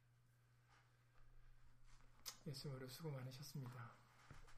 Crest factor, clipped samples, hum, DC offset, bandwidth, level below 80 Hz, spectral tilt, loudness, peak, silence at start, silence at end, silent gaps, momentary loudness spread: 22 dB; under 0.1%; none; under 0.1%; 15 kHz; -70 dBFS; -5 dB/octave; -54 LUFS; -36 dBFS; 0 s; 0 s; none; 13 LU